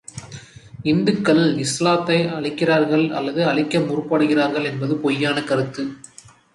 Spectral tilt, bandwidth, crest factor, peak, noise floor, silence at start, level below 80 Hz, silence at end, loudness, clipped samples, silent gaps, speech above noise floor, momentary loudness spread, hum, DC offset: -5.5 dB/octave; 11.5 kHz; 16 dB; -4 dBFS; -40 dBFS; 0.15 s; -58 dBFS; 0.55 s; -19 LUFS; under 0.1%; none; 21 dB; 13 LU; none; under 0.1%